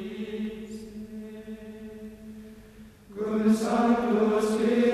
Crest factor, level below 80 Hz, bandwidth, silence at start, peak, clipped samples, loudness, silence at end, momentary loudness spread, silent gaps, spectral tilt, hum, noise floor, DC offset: 16 dB; -58 dBFS; 13.5 kHz; 0 s; -12 dBFS; under 0.1%; -26 LUFS; 0 s; 20 LU; none; -6 dB/octave; none; -49 dBFS; under 0.1%